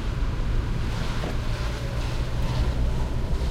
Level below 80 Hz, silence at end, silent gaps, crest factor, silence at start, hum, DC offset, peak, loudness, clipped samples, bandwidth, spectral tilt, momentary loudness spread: -26 dBFS; 0 s; none; 12 dB; 0 s; none; under 0.1%; -14 dBFS; -29 LUFS; under 0.1%; 13.5 kHz; -6 dB/octave; 3 LU